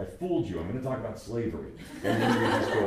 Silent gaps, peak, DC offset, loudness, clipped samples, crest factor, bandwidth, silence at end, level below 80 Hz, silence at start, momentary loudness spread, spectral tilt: none; -12 dBFS; under 0.1%; -30 LUFS; under 0.1%; 18 dB; 15.5 kHz; 0 s; -52 dBFS; 0 s; 10 LU; -6 dB/octave